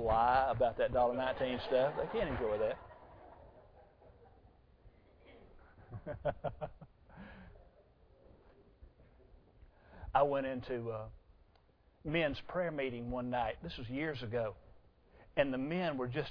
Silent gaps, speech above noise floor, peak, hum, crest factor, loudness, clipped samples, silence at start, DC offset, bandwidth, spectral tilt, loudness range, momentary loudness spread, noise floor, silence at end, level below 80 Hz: none; 32 dB; -16 dBFS; none; 22 dB; -36 LUFS; under 0.1%; 0 s; under 0.1%; 5.4 kHz; -4.5 dB/octave; 12 LU; 22 LU; -68 dBFS; 0 s; -56 dBFS